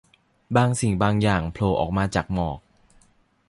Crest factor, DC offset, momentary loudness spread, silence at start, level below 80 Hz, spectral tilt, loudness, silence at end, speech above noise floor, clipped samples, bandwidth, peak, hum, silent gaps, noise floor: 20 dB; under 0.1%; 7 LU; 0.5 s; -40 dBFS; -6 dB/octave; -23 LUFS; 0.9 s; 39 dB; under 0.1%; 11.5 kHz; -4 dBFS; none; none; -60 dBFS